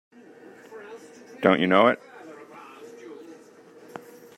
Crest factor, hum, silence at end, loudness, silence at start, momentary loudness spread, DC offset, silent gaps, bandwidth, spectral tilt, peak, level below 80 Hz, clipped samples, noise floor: 24 dB; none; 1.05 s; -21 LUFS; 0.7 s; 26 LU; under 0.1%; none; 14.5 kHz; -6.5 dB/octave; -4 dBFS; -72 dBFS; under 0.1%; -50 dBFS